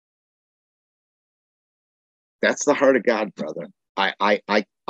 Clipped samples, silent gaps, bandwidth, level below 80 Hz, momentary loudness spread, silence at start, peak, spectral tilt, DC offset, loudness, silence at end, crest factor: under 0.1%; 3.89-3.95 s; 8.4 kHz; -76 dBFS; 14 LU; 2.4 s; -4 dBFS; -3.5 dB/octave; under 0.1%; -21 LUFS; 0.25 s; 20 dB